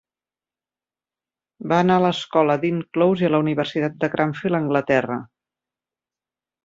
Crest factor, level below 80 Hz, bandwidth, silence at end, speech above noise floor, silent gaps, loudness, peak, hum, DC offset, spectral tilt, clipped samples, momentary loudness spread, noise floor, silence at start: 18 dB; -62 dBFS; 7.8 kHz; 1.4 s; over 70 dB; none; -20 LUFS; -4 dBFS; none; under 0.1%; -7 dB/octave; under 0.1%; 6 LU; under -90 dBFS; 1.6 s